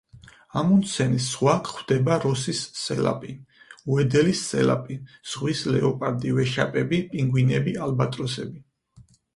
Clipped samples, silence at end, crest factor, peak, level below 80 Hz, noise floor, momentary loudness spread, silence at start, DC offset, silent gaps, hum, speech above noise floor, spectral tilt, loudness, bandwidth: under 0.1%; 0.35 s; 20 dB; -4 dBFS; -56 dBFS; -54 dBFS; 12 LU; 0.15 s; under 0.1%; none; none; 31 dB; -5.5 dB/octave; -24 LUFS; 11.5 kHz